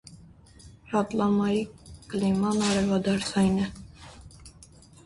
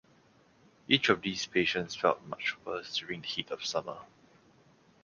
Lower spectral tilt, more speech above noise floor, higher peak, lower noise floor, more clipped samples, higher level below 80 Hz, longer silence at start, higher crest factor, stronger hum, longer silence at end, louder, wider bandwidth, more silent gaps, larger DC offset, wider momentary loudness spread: first, -5.5 dB/octave vs -3.5 dB/octave; second, 27 dB vs 32 dB; second, -12 dBFS vs -6 dBFS; second, -52 dBFS vs -64 dBFS; neither; first, -52 dBFS vs -68 dBFS; second, 0.05 s vs 0.9 s; second, 14 dB vs 28 dB; neither; second, 0.55 s vs 1 s; first, -26 LUFS vs -31 LUFS; first, 11.5 kHz vs 10 kHz; neither; neither; first, 22 LU vs 10 LU